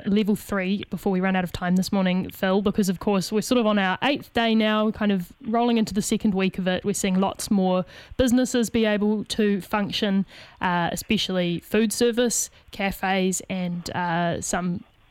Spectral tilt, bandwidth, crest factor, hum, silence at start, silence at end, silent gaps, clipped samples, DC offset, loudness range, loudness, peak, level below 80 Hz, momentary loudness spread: -4.5 dB/octave; 16.5 kHz; 16 dB; none; 0 s; 0.3 s; none; under 0.1%; under 0.1%; 2 LU; -24 LUFS; -8 dBFS; -50 dBFS; 6 LU